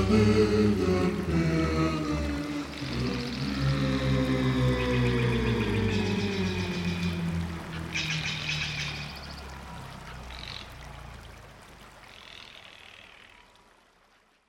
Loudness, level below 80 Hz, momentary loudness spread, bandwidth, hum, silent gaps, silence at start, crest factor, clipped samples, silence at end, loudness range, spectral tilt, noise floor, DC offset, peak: -28 LUFS; -42 dBFS; 21 LU; 16 kHz; none; none; 0 s; 18 dB; under 0.1%; 1.4 s; 17 LU; -6 dB/octave; -64 dBFS; under 0.1%; -10 dBFS